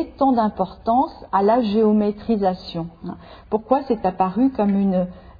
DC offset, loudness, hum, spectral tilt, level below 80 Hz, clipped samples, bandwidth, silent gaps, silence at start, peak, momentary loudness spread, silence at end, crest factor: under 0.1%; -20 LUFS; none; -10 dB/octave; -48 dBFS; under 0.1%; 5 kHz; none; 0 s; -4 dBFS; 13 LU; 0.2 s; 16 dB